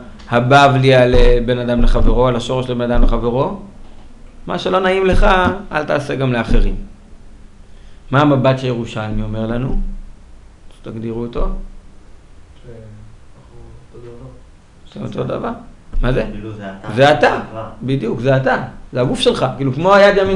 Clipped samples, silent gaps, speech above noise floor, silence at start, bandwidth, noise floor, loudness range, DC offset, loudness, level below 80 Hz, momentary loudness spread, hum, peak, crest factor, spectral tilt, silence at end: under 0.1%; none; 27 dB; 0 s; 10.5 kHz; -41 dBFS; 15 LU; under 0.1%; -16 LUFS; -22 dBFS; 18 LU; none; 0 dBFS; 16 dB; -6.5 dB/octave; 0 s